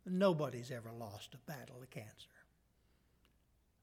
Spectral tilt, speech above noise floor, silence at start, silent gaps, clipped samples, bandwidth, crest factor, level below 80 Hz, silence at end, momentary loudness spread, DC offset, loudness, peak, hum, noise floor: -6.5 dB/octave; 34 dB; 0.05 s; none; under 0.1%; 16.5 kHz; 22 dB; -76 dBFS; 1.55 s; 21 LU; under 0.1%; -41 LUFS; -20 dBFS; none; -75 dBFS